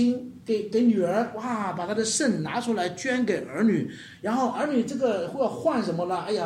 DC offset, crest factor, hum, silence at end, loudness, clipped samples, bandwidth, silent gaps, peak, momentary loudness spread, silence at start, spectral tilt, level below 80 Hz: under 0.1%; 14 dB; none; 0 s; -26 LUFS; under 0.1%; 12.5 kHz; none; -12 dBFS; 6 LU; 0 s; -4.5 dB/octave; -68 dBFS